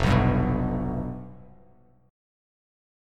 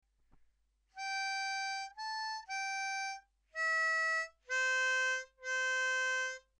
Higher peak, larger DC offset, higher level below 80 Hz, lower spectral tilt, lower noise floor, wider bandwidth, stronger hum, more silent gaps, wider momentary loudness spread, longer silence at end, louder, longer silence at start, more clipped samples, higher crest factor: first, -8 dBFS vs -24 dBFS; neither; first, -36 dBFS vs -76 dBFS; first, -8 dB/octave vs 4 dB/octave; second, -58 dBFS vs -75 dBFS; second, 9.6 kHz vs 11 kHz; neither; neither; first, 18 LU vs 10 LU; first, 1.65 s vs 0.2 s; first, -26 LUFS vs -35 LUFS; second, 0 s vs 0.95 s; neither; first, 20 dB vs 12 dB